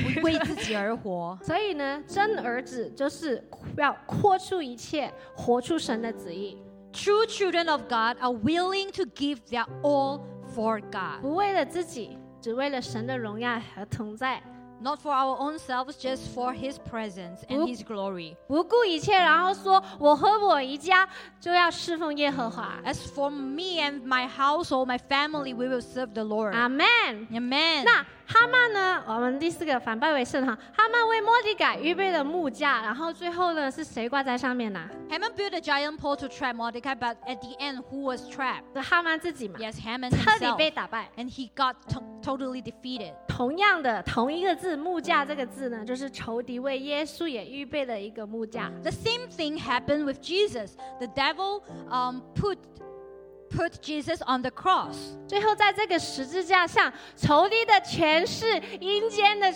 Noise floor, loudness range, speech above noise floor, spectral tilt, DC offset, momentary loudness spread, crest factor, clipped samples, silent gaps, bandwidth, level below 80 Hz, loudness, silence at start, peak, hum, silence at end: -47 dBFS; 8 LU; 20 dB; -4.5 dB/octave; under 0.1%; 14 LU; 22 dB; under 0.1%; none; 17.5 kHz; -56 dBFS; -27 LUFS; 0 s; -6 dBFS; none; 0 s